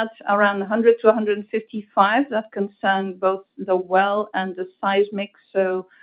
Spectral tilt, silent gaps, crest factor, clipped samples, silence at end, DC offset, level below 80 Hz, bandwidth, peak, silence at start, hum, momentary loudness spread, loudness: -10 dB/octave; none; 20 dB; under 0.1%; 0.2 s; under 0.1%; -72 dBFS; 4.9 kHz; 0 dBFS; 0 s; none; 9 LU; -21 LUFS